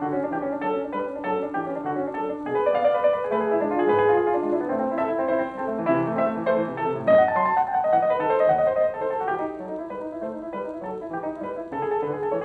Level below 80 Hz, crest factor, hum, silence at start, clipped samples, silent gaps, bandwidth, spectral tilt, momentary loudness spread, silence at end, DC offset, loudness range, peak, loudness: -60 dBFS; 16 dB; none; 0 s; under 0.1%; none; 4.7 kHz; -8.5 dB/octave; 12 LU; 0 s; under 0.1%; 5 LU; -8 dBFS; -24 LUFS